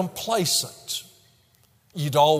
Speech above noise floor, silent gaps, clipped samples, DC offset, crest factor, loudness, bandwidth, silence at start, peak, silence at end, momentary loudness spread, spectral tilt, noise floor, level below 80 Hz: 38 dB; none; under 0.1%; under 0.1%; 20 dB; -24 LUFS; 16 kHz; 0 s; -6 dBFS; 0 s; 11 LU; -3.5 dB/octave; -61 dBFS; -66 dBFS